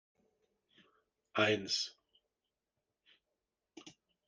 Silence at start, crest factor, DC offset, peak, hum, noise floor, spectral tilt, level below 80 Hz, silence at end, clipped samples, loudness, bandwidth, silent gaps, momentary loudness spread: 1.35 s; 24 dB; under 0.1%; -18 dBFS; none; -90 dBFS; -3 dB/octave; -84 dBFS; 0.35 s; under 0.1%; -35 LUFS; 10 kHz; none; 25 LU